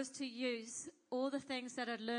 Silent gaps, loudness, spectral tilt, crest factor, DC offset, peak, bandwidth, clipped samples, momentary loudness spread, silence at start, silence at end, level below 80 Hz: none; -42 LUFS; -2.5 dB/octave; 16 dB; under 0.1%; -26 dBFS; 10.5 kHz; under 0.1%; 5 LU; 0 s; 0 s; under -90 dBFS